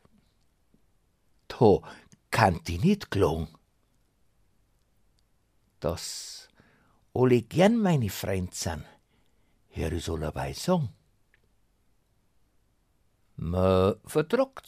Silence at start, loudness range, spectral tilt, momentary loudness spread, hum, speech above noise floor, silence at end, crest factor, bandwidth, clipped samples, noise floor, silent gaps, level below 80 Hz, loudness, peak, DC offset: 1.5 s; 9 LU; -6 dB/octave; 15 LU; none; 43 dB; 0.1 s; 24 dB; 15.5 kHz; under 0.1%; -69 dBFS; none; -50 dBFS; -27 LUFS; -6 dBFS; under 0.1%